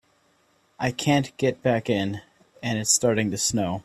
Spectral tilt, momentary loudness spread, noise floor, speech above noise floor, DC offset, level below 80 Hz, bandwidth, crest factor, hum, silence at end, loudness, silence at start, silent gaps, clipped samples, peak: -4 dB/octave; 10 LU; -64 dBFS; 40 dB; under 0.1%; -58 dBFS; 15.5 kHz; 20 dB; none; 0.05 s; -24 LUFS; 0.8 s; none; under 0.1%; -6 dBFS